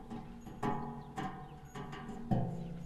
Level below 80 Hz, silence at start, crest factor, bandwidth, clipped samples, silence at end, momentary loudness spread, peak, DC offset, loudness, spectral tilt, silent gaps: -54 dBFS; 0 s; 22 dB; 13 kHz; under 0.1%; 0 s; 12 LU; -20 dBFS; under 0.1%; -41 LUFS; -7.5 dB/octave; none